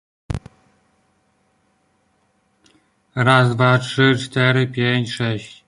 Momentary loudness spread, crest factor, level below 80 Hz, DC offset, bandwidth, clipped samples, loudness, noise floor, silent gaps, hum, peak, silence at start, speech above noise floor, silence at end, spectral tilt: 16 LU; 20 dB; -46 dBFS; under 0.1%; 11 kHz; under 0.1%; -17 LUFS; -64 dBFS; none; none; -2 dBFS; 0.3 s; 47 dB; 0.15 s; -6 dB/octave